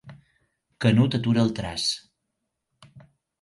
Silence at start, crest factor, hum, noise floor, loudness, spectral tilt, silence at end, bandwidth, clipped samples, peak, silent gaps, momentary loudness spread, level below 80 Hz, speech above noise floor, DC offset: 0.05 s; 20 dB; none; -80 dBFS; -24 LUFS; -5.5 dB/octave; 0.4 s; 11.5 kHz; under 0.1%; -6 dBFS; none; 6 LU; -54 dBFS; 58 dB; under 0.1%